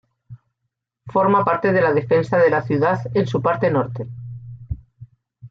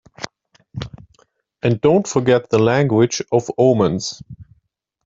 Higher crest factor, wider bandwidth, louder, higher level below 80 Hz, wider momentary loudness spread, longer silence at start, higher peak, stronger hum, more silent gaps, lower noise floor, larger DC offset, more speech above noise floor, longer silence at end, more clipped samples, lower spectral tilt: about the same, 16 dB vs 16 dB; about the same, 7.4 kHz vs 7.8 kHz; about the same, -18 LUFS vs -17 LUFS; about the same, -48 dBFS vs -52 dBFS; about the same, 17 LU vs 18 LU; about the same, 0.3 s vs 0.2 s; about the same, -4 dBFS vs -2 dBFS; neither; neither; first, -78 dBFS vs -66 dBFS; neither; first, 60 dB vs 50 dB; second, 0.05 s vs 0.65 s; neither; first, -8.5 dB/octave vs -6 dB/octave